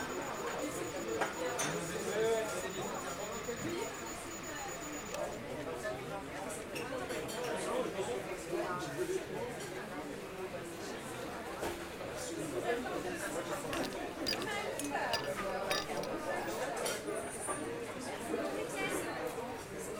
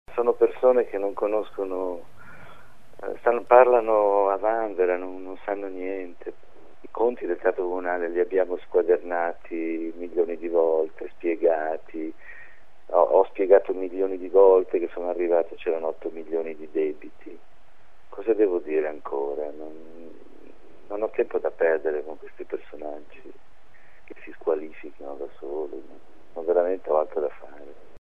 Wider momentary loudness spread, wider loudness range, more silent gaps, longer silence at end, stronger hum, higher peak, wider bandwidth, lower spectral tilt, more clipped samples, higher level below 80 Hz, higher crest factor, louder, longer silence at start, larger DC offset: second, 7 LU vs 20 LU; second, 4 LU vs 8 LU; neither; about the same, 0 s vs 0.05 s; neither; second, -20 dBFS vs -2 dBFS; first, 16.5 kHz vs 3.8 kHz; second, -3.5 dB/octave vs -7.5 dB/octave; neither; about the same, -62 dBFS vs -62 dBFS; about the same, 20 dB vs 24 dB; second, -39 LUFS vs -24 LUFS; about the same, 0 s vs 0.05 s; second, under 0.1% vs 1%